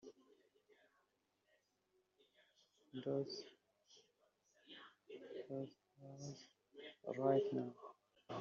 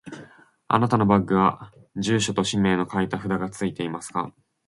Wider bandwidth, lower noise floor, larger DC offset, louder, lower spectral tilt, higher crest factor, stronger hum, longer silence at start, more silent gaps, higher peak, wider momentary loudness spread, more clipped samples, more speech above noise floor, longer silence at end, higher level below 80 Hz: second, 7.4 kHz vs 11.5 kHz; first, -84 dBFS vs -50 dBFS; neither; second, -45 LUFS vs -23 LUFS; about the same, -6 dB/octave vs -5.5 dB/octave; about the same, 24 dB vs 22 dB; first, 50 Hz at -90 dBFS vs none; about the same, 0.05 s vs 0.05 s; neither; second, -24 dBFS vs -2 dBFS; first, 23 LU vs 17 LU; neither; first, 41 dB vs 27 dB; second, 0 s vs 0.35 s; second, under -90 dBFS vs -54 dBFS